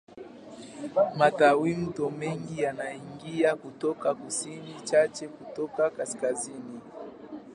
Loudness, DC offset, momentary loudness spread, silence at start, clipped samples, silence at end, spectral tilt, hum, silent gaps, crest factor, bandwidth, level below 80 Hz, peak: -28 LUFS; under 0.1%; 21 LU; 0.1 s; under 0.1%; 0 s; -4.5 dB/octave; none; none; 22 dB; 11.5 kHz; -68 dBFS; -6 dBFS